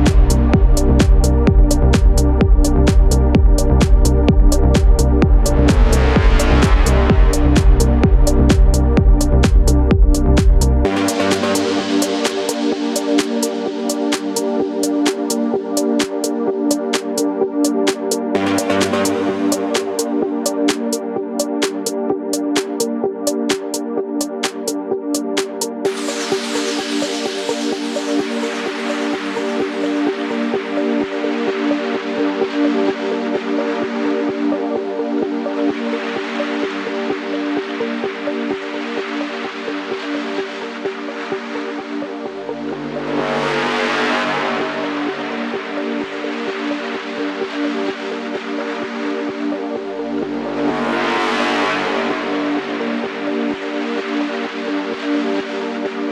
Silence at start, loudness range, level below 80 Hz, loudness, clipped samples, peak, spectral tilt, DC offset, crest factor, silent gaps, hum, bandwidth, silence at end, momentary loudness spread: 0 s; 9 LU; -20 dBFS; -18 LUFS; under 0.1%; -2 dBFS; -5.5 dB/octave; under 0.1%; 14 dB; none; none; 14.5 kHz; 0 s; 9 LU